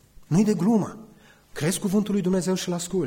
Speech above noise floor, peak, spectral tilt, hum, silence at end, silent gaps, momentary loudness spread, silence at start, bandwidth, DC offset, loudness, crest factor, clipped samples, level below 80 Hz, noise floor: 29 dB; -10 dBFS; -6 dB/octave; none; 0 s; none; 7 LU; 0.2 s; 16.5 kHz; under 0.1%; -24 LUFS; 14 dB; under 0.1%; -56 dBFS; -52 dBFS